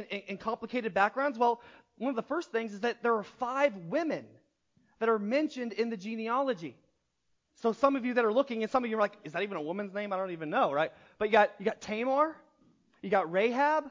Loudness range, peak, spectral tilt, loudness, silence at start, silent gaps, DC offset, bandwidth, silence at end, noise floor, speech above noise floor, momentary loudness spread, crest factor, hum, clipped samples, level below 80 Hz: 3 LU; -10 dBFS; -5.5 dB/octave; -31 LUFS; 0 s; none; under 0.1%; 7.6 kHz; 0 s; -78 dBFS; 47 dB; 9 LU; 20 dB; none; under 0.1%; -74 dBFS